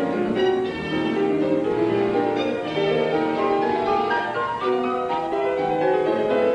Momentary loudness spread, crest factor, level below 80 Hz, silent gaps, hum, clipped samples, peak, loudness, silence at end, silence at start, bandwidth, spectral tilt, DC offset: 3 LU; 12 dB; -54 dBFS; none; none; under 0.1%; -8 dBFS; -22 LUFS; 0 s; 0 s; 9.4 kHz; -6.5 dB/octave; under 0.1%